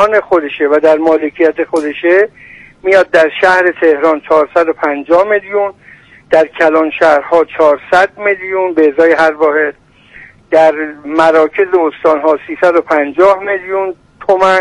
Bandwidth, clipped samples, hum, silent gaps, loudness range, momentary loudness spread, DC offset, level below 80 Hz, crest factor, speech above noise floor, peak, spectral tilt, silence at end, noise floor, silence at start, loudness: 11 kHz; 0.2%; none; none; 1 LU; 7 LU; under 0.1%; -50 dBFS; 10 dB; 28 dB; 0 dBFS; -5 dB/octave; 0 s; -38 dBFS; 0 s; -11 LUFS